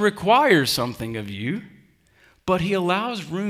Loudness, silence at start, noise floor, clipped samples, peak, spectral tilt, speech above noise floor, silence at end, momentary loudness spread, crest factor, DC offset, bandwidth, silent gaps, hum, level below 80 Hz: -21 LUFS; 0 s; -58 dBFS; under 0.1%; -4 dBFS; -5 dB/octave; 36 dB; 0 s; 14 LU; 18 dB; under 0.1%; 16.5 kHz; none; none; -54 dBFS